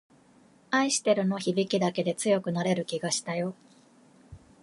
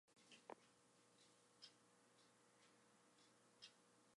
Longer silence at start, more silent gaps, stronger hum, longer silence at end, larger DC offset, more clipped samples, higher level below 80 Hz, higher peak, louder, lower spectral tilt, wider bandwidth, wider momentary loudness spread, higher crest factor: first, 0.7 s vs 0.05 s; neither; second, none vs 60 Hz at -85 dBFS; first, 0.25 s vs 0 s; neither; neither; first, -68 dBFS vs under -90 dBFS; first, -10 dBFS vs -42 dBFS; first, -28 LUFS vs -66 LUFS; first, -4 dB/octave vs -2 dB/octave; about the same, 11.5 kHz vs 11.5 kHz; about the same, 5 LU vs 3 LU; second, 18 dB vs 28 dB